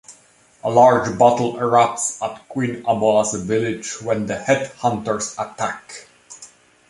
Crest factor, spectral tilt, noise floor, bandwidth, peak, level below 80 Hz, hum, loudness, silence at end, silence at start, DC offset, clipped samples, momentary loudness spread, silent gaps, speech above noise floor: 18 dB; -4.5 dB/octave; -53 dBFS; 11.5 kHz; -2 dBFS; -56 dBFS; none; -19 LUFS; 0.45 s; 0.1 s; under 0.1%; under 0.1%; 14 LU; none; 35 dB